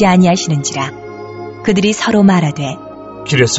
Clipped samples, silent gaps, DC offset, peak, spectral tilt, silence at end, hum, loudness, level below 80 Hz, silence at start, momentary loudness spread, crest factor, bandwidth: under 0.1%; none; under 0.1%; 0 dBFS; -5 dB/octave; 0 s; none; -13 LUFS; -46 dBFS; 0 s; 18 LU; 14 dB; 8.2 kHz